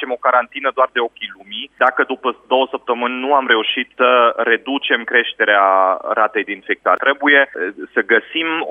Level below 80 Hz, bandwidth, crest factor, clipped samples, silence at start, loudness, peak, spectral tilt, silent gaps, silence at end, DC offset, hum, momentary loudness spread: -68 dBFS; 4.7 kHz; 16 dB; under 0.1%; 0 s; -16 LUFS; 0 dBFS; -5 dB/octave; none; 0 s; under 0.1%; none; 9 LU